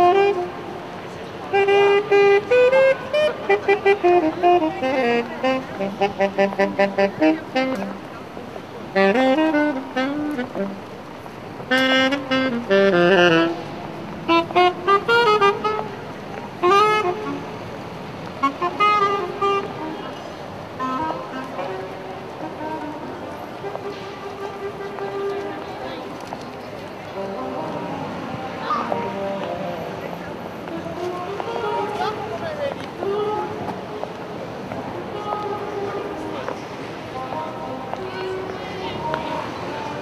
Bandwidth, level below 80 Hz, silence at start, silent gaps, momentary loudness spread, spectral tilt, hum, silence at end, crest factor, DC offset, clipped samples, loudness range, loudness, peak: 14 kHz; -56 dBFS; 0 s; none; 17 LU; -5.5 dB/octave; none; 0 s; 20 dB; under 0.1%; under 0.1%; 12 LU; -21 LUFS; -2 dBFS